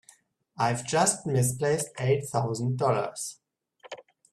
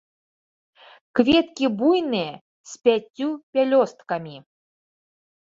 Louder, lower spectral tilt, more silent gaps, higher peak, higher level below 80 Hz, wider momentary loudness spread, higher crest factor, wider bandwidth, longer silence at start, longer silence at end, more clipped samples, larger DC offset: second, -27 LUFS vs -22 LUFS; about the same, -4.5 dB/octave vs -5 dB/octave; second, none vs 2.41-2.64 s, 3.10-3.14 s, 3.43-3.53 s; second, -8 dBFS vs -4 dBFS; about the same, -64 dBFS vs -60 dBFS; first, 19 LU vs 13 LU; about the same, 20 dB vs 20 dB; first, 13.5 kHz vs 7.8 kHz; second, 0.6 s vs 1.15 s; second, 0.3 s vs 1.2 s; neither; neither